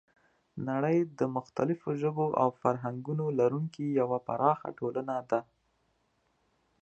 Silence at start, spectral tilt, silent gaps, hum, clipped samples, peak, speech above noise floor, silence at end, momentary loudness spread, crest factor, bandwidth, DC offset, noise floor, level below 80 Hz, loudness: 0.55 s; -9 dB/octave; none; none; under 0.1%; -10 dBFS; 44 dB; 1.4 s; 7 LU; 22 dB; 8.2 kHz; under 0.1%; -74 dBFS; -74 dBFS; -31 LUFS